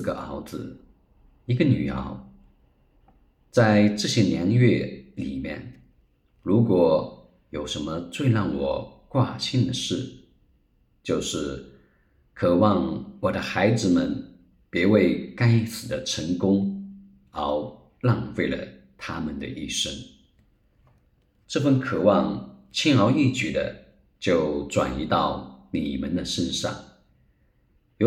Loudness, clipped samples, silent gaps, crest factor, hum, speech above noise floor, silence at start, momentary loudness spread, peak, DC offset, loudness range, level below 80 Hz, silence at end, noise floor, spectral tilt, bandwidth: -24 LUFS; under 0.1%; none; 20 dB; none; 41 dB; 0 s; 16 LU; -4 dBFS; under 0.1%; 6 LU; -50 dBFS; 0 s; -64 dBFS; -6 dB/octave; 14.5 kHz